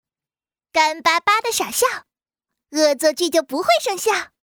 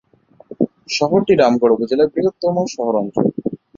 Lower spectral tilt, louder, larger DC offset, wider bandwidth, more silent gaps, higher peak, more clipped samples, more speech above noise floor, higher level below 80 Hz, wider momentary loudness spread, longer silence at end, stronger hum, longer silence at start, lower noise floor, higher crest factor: second, -0.5 dB/octave vs -6 dB/octave; about the same, -18 LUFS vs -17 LUFS; neither; first, over 20 kHz vs 7.6 kHz; neither; about the same, -4 dBFS vs -2 dBFS; neither; first, over 71 dB vs 26 dB; second, -64 dBFS vs -56 dBFS; second, 5 LU vs 9 LU; about the same, 0.15 s vs 0.2 s; neither; first, 0.75 s vs 0.5 s; first, under -90 dBFS vs -42 dBFS; about the same, 18 dB vs 16 dB